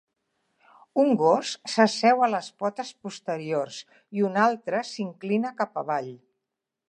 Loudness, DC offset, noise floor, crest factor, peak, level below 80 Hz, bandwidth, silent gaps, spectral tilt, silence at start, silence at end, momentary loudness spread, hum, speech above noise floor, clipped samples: -25 LUFS; under 0.1%; -85 dBFS; 22 dB; -4 dBFS; -82 dBFS; 10 kHz; none; -5 dB/octave; 0.95 s; 0.75 s; 15 LU; none; 60 dB; under 0.1%